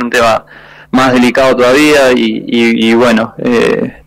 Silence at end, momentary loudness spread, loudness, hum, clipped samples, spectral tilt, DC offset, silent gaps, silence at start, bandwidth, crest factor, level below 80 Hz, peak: 0.15 s; 6 LU; -9 LUFS; none; under 0.1%; -4.5 dB/octave; under 0.1%; none; 0 s; 16 kHz; 6 dB; -40 dBFS; -2 dBFS